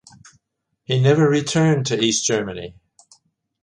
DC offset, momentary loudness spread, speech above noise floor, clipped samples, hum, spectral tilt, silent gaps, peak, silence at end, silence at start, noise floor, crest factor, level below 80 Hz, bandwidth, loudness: under 0.1%; 15 LU; 57 dB; under 0.1%; none; -4.5 dB/octave; none; -4 dBFS; 0.9 s; 0.9 s; -75 dBFS; 16 dB; -56 dBFS; 11 kHz; -18 LUFS